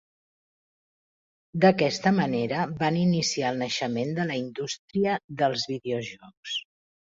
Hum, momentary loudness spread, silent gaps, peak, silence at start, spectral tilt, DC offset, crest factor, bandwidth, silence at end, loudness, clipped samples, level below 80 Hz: none; 11 LU; 4.79-4.88 s, 5.24-5.28 s, 6.37-6.43 s; -6 dBFS; 1.55 s; -5 dB/octave; under 0.1%; 22 dB; 7.8 kHz; 0.6 s; -26 LUFS; under 0.1%; -66 dBFS